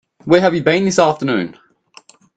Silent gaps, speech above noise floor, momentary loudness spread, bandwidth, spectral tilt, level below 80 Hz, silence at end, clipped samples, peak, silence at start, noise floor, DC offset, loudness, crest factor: none; 33 dB; 8 LU; 9 kHz; -5 dB/octave; -54 dBFS; 0.85 s; under 0.1%; 0 dBFS; 0.25 s; -47 dBFS; under 0.1%; -15 LUFS; 16 dB